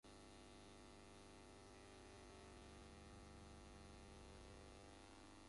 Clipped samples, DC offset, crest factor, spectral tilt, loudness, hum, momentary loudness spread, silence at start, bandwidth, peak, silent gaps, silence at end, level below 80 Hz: under 0.1%; under 0.1%; 10 dB; -4.5 dB/octave; -62 LUFS; none; 1 LU; 0.05 s; 11.5 kHz; -52 dBFS; none; 0 s; -68 dBFS